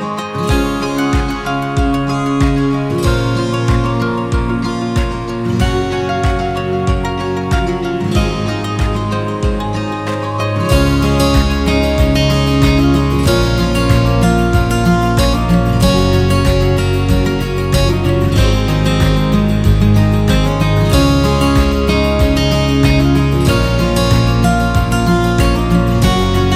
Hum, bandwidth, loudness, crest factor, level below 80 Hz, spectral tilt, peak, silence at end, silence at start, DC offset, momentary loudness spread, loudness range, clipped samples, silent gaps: none; 16 kHz; -14 LUFS; 12 dB; -20 dBFS; -6 dB/octave; 0 dBFS; 0 s; 0 s; under 0.1%; 6 LU; 4 LU; under 0.1%; none